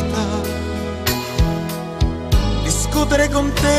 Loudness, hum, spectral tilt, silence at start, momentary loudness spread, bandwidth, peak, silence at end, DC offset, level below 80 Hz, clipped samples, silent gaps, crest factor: -19 LUFS; none; -4.5 dB/octave; 0 s; 8 LU; 15.5 kHz; -2 dBFS; 0 s; under 0.1%; -24 dBFS; under 0.1%; none; 16 dB